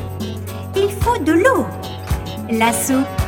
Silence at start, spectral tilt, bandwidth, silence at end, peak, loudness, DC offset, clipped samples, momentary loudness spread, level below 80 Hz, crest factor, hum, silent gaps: 0 s; -5 dB/octave; 17.5 kHz; 0 s; -2 dBFS; -18 LUFS; under 0.1%; under 0.1%; 12 LU; -32 dBFS; 16 dB; none; none